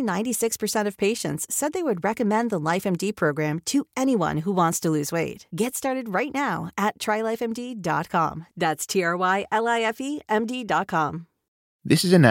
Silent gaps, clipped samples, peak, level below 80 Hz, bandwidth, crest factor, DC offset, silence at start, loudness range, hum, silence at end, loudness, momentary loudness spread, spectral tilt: 11.48-11.80 s; under 0.1%; -2 dBFS; -62 dBFS; 17 kHz; 22 dB; under 0.1%; 0 s; 2 LU; none; 0 s; -24 LUFS; 5 LU; -4.5 dB/octave